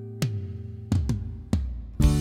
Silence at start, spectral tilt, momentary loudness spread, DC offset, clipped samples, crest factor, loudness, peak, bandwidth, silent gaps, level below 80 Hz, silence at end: 0 s; -7 dB/octave; 11 LU; under 0.1%; under 0.1%; 18 dB; -29 LUFS; -8 dBFS; 16.5 kHz; none; -30 dBFS; 0 s